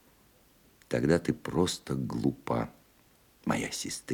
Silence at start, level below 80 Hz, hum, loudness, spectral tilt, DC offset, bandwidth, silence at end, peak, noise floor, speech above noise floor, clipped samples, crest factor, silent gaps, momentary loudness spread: 0.9 s; -56 dBFS; none; -31 LUFS; -5 dB/octave; under 0.1%; 19.5 kHz; 0 s; -12 dBFS; -63 dBFS; 33 dB; under 0.1%; 22 dB; none; 8 LU